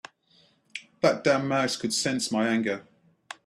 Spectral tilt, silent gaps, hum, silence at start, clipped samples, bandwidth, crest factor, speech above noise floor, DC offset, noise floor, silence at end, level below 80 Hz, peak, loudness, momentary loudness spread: -4 dB/octave; none; none; 0.75 s; under 0.1%; 13.5 kHz; 20 dB; 38 dB; under 0.1%; -63 dBFS; 0.65 s; -70 dBFS; -8 dBFS; -26 LUFS; 17 LU